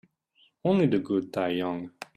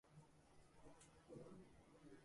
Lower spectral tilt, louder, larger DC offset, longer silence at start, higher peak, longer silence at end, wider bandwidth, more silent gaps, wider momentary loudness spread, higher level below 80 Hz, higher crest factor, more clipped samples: first, -8 dB/octave vs -5.5 dB/octave; first, -27 LUFS vs -65 LUFS; neither; first, 0.65 s vs 0.05 s; first, -12 dBFS vs -48 dBFS; about the same, 0.1 s vs 0 s; about the same, 12.5 kHz vs 11.5 kHz; neither; about the same, 9 LU vs 8 LU; first, -68 dBFS vs -78 dBFS; about the same, 16 dB vs 16 dB; neither